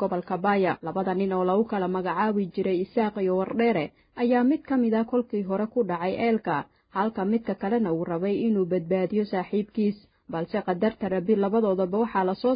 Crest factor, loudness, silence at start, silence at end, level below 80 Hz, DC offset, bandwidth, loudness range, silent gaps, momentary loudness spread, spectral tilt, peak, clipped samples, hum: 16 dB; -26 LUFS; 0 s; 0 s; -62 dBFS; under 0.1%; 5.2 kHz; 2 LU; none; 5 LU; -11.5 dB/octave; -10 dBFS; under 0.1%; none